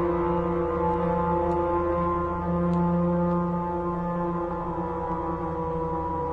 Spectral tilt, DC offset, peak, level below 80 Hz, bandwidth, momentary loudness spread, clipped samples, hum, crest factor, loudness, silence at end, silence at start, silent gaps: -10.5 dB/octave; under 0.1%; -12 dBFS; -42 dBFS; 4.1 kHz; 5 LU; under 0.1%; none; 12 dB; -27 LUFS; 0 s; 0 s; none